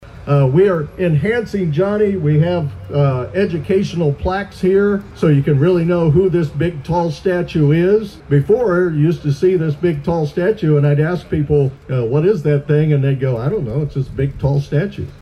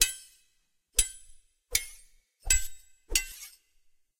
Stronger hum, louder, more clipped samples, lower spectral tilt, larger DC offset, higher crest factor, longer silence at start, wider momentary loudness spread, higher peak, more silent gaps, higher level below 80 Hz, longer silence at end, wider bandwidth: neither; first, -16 LUFS vs -29 LUFS; neither; first, -9 dB/octave vs 1 dB/octave; neither; second, 12 dB vs 26 dB; about the same, 0 s vs 0 s; second, 6 LU vs 20 LU; about the same, -4 dBFS vs -6 dBFS; neither; about the same, -38 dBFS vs -42 dBFS; second, 0.05 s vs 0.7 s; second, 6.8 kHz vs 16 kHz